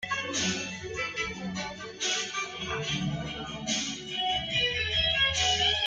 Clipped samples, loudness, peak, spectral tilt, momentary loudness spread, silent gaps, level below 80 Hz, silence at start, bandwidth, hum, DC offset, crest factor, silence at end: under 0.1%; -28 LUFS; -14 dBFS; -2 dB/octave; 11 LU; none; -50 dBFS; 0 s; 10 kHz; none; under 0.1%; 16 dB; 0 s